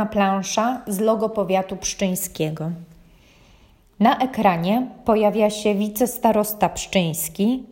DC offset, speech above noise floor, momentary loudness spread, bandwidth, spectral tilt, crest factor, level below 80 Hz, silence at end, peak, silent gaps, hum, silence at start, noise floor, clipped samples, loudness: under 0.1%; 32 dB; 6 LU; 16.5 kHz; -5 dB/octave; 18 dB; -50 dBFS; 0 s; -4 dBFS; none; none; 0 s; -53 dBFS; under 0.1%; -21 LUFS